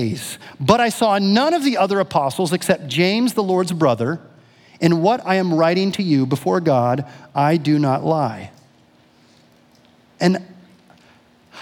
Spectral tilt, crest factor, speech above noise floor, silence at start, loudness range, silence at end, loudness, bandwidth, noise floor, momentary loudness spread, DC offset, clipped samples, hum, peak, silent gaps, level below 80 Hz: -6 dB/octave; 18 dB; 36 dB; 0 s; 6 LU; 0 s; -18 LUFS; 18 kHz; -53 dBFS; 9 LU; under 0.1%; under 0.1%; none; 0 dBFS; none; -62 dBFS